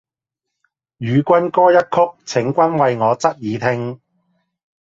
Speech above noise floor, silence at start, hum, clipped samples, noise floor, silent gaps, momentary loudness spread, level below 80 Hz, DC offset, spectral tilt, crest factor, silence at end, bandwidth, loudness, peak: 67 dB; 1 s; none; under 0.1%; -82 dBFS; none; 8 LU; -60 dBFS; under 0.1%; -6.5 dB/octave; 16 dB; 0.9 s; 7.8 kHz; -16 LUFS; 0 dBFS